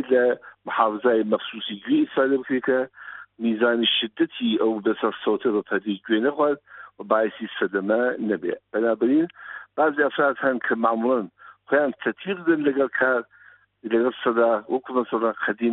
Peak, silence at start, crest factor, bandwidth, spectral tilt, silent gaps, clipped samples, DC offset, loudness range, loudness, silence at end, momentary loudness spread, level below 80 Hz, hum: -4 dBFS; 0 s; 20 dB; 4.1 kHz; -2.5 dB/octave; none; under 0.1%; under 0.1%; 1 LU; -23 LUFS; 0 s; 8 LU; -72 dBFS; none